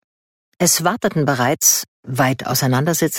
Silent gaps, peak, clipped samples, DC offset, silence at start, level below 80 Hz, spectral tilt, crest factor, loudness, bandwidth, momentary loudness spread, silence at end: 1.88-2.03 s; -2 dBFS; under 0.1%; under 0.1%; 0.6 s; -58 dBFS; -3.5 dB/octave; 16 dB; -17 LUFS; 17.5 kHz; 5 LU; 0 s